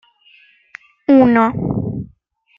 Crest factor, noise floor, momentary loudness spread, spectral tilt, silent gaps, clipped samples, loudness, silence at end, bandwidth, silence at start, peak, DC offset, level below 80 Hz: 16 dB; -55 dBFS; 18 LU; -10 dB/octave; none; under 0.1%; -15 LUFS; 0.55 s; 5.6 kHz; 1.1 s; -2 dBFS; under 0.1%; -46 dBFS